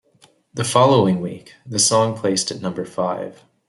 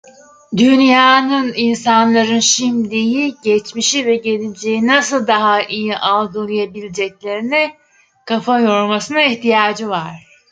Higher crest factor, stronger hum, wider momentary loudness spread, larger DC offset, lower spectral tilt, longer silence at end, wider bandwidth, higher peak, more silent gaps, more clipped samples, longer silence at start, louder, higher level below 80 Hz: about the same, 18 dB vs 14 dB; neither; first, 16 LU vs 11 LU; neither; about the same, -4 dB/octave vs -3 dB/octave; about the same, 0.35 s vs 0.3 s; first, 12.5 kHz vs 9.4 kHz; about the same, -2 dBFS vs 0 dBFS; neither; neither; about the same, 0.55 s vs 0.5 s; second, -19 LUFS vs -14 LUFS; about the same, -60 dBFS vs -62 dBFS